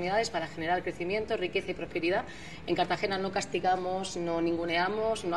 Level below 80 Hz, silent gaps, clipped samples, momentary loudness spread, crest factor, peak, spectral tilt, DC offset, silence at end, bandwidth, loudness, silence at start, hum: -56 dBFS; none; under 0.1%; 5 LU; 16 dB; -14 dBFS; -4.5 dB/octave; 0.4%; 0 s; 12 kHz; -31 LUFS; 0 s; none